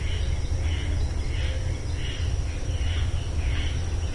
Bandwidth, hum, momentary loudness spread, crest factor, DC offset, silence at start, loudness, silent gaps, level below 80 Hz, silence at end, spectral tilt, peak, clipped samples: 11.5 kHz; none; 2 LU; 12 dB; under 0.1%; 0 s; -29 LUFS; none; -28 dBFS; 0 s; -5 dB/octave; -14 dBFS; under 0.1%